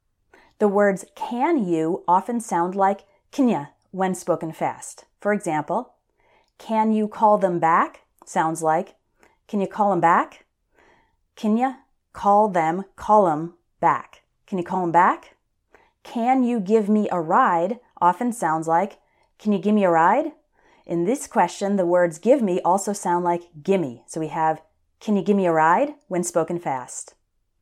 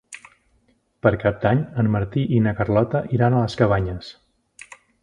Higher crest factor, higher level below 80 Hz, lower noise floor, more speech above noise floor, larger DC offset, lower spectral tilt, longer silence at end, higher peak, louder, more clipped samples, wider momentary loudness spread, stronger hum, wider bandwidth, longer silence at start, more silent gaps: about the same, 18 dB vs 20 dB; second, -66 dBFS vs -44 dBFS; about the same, -62 dBFS vs -63 dBFS; about the same, 41 dB vs 44 dB; neither; second, -6 dB/octave vs -8 dB/octave; second, 0.6 s vs 0.9 s; about the same, -4 dBFS vs -2 dBFS; about the same, -22 LUFS vs -21 LUFS; neither; about the same, 12 LU vs 13 LU; neither; first, 14 kHz vs 10 kHz; first, 0.6 s vs 0.1 s; neither